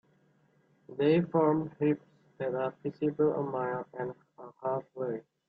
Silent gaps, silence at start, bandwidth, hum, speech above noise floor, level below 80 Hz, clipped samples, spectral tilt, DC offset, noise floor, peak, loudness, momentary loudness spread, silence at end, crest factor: none; 0.9 s; 4.9 kHz; none; 37 dB; -74 dBFS; under 0.1%; -10.5 dB/octave; under 0.1%; -68 dBFS; -14 dBFS; -32 LUFS; 12 LU; 0.3 s; 18 dB